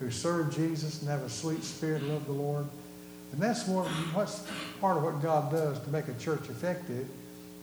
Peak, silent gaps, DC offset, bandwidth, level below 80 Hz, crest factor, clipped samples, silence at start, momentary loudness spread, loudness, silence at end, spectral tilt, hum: -16 dBFS; none; under 0.1%; over 20 kHz; -68 dBFS; 18 dB; under 0.1%; 0 s; 11 LU; -33 LUFS; 0 s; -5.5 dB/octave; none